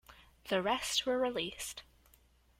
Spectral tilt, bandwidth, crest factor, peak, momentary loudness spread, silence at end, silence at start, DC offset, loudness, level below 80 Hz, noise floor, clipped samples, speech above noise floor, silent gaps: -2.5 dB/octave; 16.5 kHz; 18 dB; -20 dBFS; 14 LU; 0.8 s; 0.1 s; under 0.1%; -34 LUFS; -64 dBFS; -67 dBFS; under 0.1%; 32 dB; none